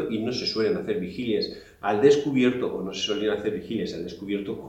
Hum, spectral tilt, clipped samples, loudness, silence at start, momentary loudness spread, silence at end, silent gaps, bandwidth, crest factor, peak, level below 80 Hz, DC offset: none; -5.5 dB/octave; under 0.1%; -26 LUFS; 0 s; 11 LU; 0 s; none; 8.4 kHz; 20 dB; -6 dBFS; -58 dBFS; under 0.1%